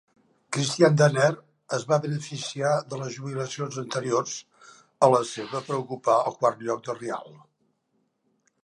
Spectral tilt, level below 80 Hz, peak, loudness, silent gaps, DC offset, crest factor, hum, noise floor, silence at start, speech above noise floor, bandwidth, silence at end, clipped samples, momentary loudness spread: -5 dB/octave; -76 dBFS; -4 dBFS; -25 LUFS; none; under 0.1%; 22 dB; none; -73 dBFS; 0.5 s; 48 dB; 11.5 kHz; 1.3 s; under 0.1%; 13 LU